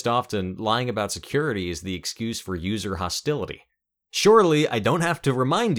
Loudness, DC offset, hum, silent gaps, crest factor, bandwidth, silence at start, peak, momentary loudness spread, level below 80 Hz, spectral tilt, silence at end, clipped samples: -23 LUFS; under 0.1%; none; none; 18 dB; 18.5 kHz; 0 s; -4 dBFS; 13 LU; -52 dBFS; -5 dB/octave; 0 s; under 0.1%